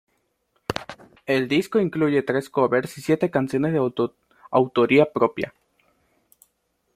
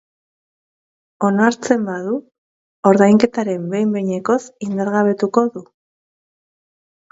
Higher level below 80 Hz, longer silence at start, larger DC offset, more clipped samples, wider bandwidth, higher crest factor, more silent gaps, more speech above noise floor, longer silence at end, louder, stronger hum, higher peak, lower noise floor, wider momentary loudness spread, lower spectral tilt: about the same, -60 dBFS vs -62 dBFS; second, 0.7 s vs 1.2 s; neither; neither; first, 15 kHz vs 8 kHz; about the same, 22 dB vs 18 dB; second, none vs 2.38-2.83 s; second, 50 dB vs over 74 dB; about the same, 1.45 s vs 1.5 s; second, -22 LUFS vs -17 LUFS; neither; about the same, -2 dBFS vs 0 dBFS; second, -71 dBFS vs under -90 dBFS; first, 14 LU vs 11 LU; about the same, -6.5 dB/octave vs -6.5 dB/octave